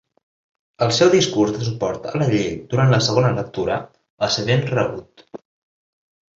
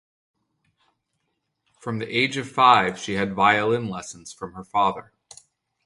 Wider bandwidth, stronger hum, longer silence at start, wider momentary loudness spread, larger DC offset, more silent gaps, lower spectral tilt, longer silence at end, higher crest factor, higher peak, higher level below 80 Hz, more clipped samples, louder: second, 8 kHz vs 11.5 kHz; neither; second, 0.8 s vs 1.85 s; second, 10 LU vs 20 LU; neither; first, 4.10-4.17 s vs none; about the same, -5.5 dB/octave vs -4.5 dB/octave; first, 1.05 s vs 0.85 s; second, 18 dB vs 24 dB; about the same, -2 dBFS vs -2 dBFS; first, -52 dBFS vs -60 dBFS; neither; about the same, -19 LUFS vs -21 LUFS